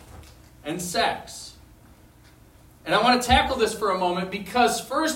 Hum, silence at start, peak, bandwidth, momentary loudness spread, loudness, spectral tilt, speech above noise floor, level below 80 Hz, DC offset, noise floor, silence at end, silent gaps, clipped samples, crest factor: none; 0.05 s; -4 dBFS; 16.5 kHz; 19 LU; -23 LUFS; -3.5 dB/octave; 29 dB; -44 dBFS; under 0.1%; -52 dBFS; 0 s; none; under 0.1%; 20 dB